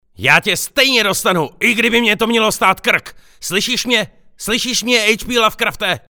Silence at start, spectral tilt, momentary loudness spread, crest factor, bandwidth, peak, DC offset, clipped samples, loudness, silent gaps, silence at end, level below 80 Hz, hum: 0.2 s; -2.5 dB/octave; 7 LU; 16 dB; over 20 kHz; 0 dBFS; under 0.1%; under 0.1%; -14 LUFS; none; 0.15 s; -44 dBFS; none